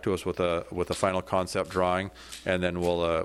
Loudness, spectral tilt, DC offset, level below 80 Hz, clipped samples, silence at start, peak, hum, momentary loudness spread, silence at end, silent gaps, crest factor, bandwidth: -29 LUFS; -5 dB/octave; under 0.1%; -52 dBFS; under 0.1%; 0 s; -10 dBFS; none; 5 LU; 0 s; none; 18 dB; 14 kHz